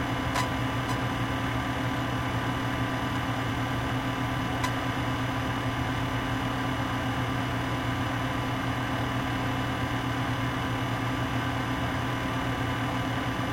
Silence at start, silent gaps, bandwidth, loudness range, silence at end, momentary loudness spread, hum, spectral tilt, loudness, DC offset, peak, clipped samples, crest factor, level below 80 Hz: 0 s; none; 16.5 kHz; 0 LU; 0 s; 1 LU; 60 Hz at -35 dBFS; -5.5 dB/octave; -29 LUFS; under 0.1%; -14 dBFS; under 0.1%; 14 dB; -42 dBFS